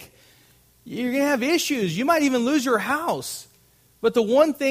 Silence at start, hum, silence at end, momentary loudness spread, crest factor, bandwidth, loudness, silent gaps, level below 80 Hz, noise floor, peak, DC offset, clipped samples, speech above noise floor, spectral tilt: 0 s; none; 0 s; 10 LU; 18 dB; 15.5 kHz; -22 LUFS; none; -64 dBFS; -58 dBFS; -4 dBFS; under 0.1%; under 0.1%; 37 dB; -4 dB/octave